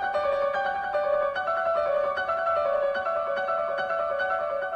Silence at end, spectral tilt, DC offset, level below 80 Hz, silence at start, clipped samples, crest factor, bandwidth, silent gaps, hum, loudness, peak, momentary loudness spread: 0 s; -4 dB/octave; under 0.1%; -60 dBFS; 0 s; under 0.1%; 12 dB; 7 kHz; none; none; -26 LUFS; -14 dBFS; 2 LU